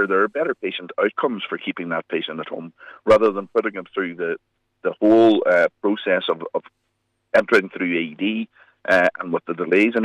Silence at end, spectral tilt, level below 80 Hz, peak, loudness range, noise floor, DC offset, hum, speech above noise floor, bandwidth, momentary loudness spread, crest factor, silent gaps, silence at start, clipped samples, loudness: 0 s; -6 dB/octave; -62 dBFS; -6 dBFS; 4 LU; -72 dBFS; under 0.1%; none; 52 dB; 10 kHz; 13 LU; 14 dB; none; 0 s; under 0.1%; -21 LUFS